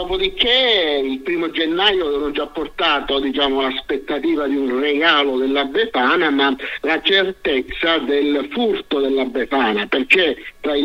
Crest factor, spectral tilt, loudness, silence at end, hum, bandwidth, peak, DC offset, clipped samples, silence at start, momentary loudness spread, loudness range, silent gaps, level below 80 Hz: 18 dB; -4.5 dB/octave; -17 LUFS; 0 s; none; 15 kHz; 0 dBFS; under 0.1%; under 0.1%; 0 s; 7 LU; 2 LU; none; -44 dBFS